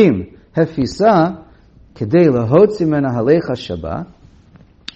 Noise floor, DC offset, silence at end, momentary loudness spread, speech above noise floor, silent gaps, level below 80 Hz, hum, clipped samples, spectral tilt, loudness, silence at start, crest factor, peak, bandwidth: -46 dBFS; under 0.1%; 0.9 s; 15 LU; 32 dB; none; -46 dBFS; none; under 0.1%; -8 dB/octave; -15 LUFS; 0 s; 16 dB; 0 dBFS; 8.2 kHz